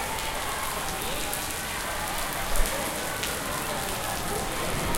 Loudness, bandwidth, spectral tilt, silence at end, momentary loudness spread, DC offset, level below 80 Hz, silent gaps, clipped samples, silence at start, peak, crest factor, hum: -29 LUFS; 17 kHz; -2.5 dB/octave; 0 s; 2 LU; under 0.1%; -36 dBFS; none; under 0.1%; 0 s; -6 dBFS; 24 dB; none